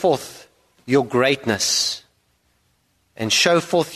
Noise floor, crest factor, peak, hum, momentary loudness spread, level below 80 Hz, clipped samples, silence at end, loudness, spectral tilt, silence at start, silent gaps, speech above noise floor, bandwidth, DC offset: -65 dBFS; 20 dB; 0 dBFS; 60 Hz at -55 dBFS; 12 LU; -60 dBFS; under 0.1%; 0 s; -19 LUFS; -3 dB/octave; 0 s; none; 46 dB; 13.5 kHz; under 0.1%